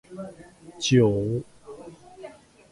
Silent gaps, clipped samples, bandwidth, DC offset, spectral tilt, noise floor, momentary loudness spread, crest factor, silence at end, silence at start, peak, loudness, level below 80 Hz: none; under 0.1%; 11.5 kHz; under 0.1%; -5.5 dB/octave; -47 dBFS; 25 LU; 20 dB; 0.4 s; 0.1 s; -8 dBFS; -23 LUFS; -54 dBFS